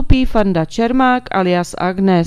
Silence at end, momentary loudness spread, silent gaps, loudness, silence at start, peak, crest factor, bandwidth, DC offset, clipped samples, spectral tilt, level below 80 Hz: 0 s; 3 LU; none; -15 LUFS; 0 s; 0 dBFS; 14 dB; 12.5 kHz; under 0.1%; under 0.1%; -6.5 dB/octave; -24 dBFS